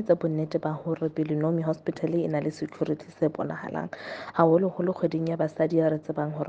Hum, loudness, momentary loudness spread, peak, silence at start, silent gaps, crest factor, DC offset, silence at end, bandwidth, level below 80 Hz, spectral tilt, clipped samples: none; -27 LUFS; 9 LU; -6 dBFS; 0 s; none; 20 dB; under 0.1%; 0 s; 8 kHz; -68 dBFS; -9 dB/octave; under 0.1%